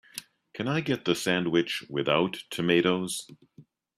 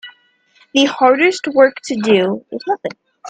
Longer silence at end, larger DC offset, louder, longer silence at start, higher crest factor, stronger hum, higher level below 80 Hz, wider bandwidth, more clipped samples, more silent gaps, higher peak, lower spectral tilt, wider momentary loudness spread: first, 0.35 s vs 0 s; neither; second, -27 LUFS vs -15 LUFS; about the same, 0.15 s vs 0.05 s; about the same, 20 dB vs 16 dB; neither; about the same, -66 dBFS vs -64 dBFS; first, 15 kHz vs 9.2 kHz; neither; neither; second, -8 dBFS vs 0 dBFS; about the same, -4.5 dB/octave vs -4 dB/octave; about the same, 12 LU vs 10 LU